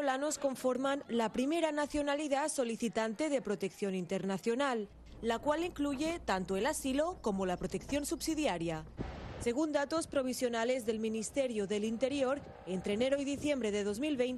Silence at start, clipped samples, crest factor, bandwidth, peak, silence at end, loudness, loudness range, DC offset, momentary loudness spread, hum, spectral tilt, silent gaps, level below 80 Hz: 0 s; under 0.1%; 16 dB; 13 kHz; -18 dBFS; 0 s; -35 LUFS; 2 LU; under 0.1%; 5 LU; none; -4.5 dB/octave; none; -56 dBFS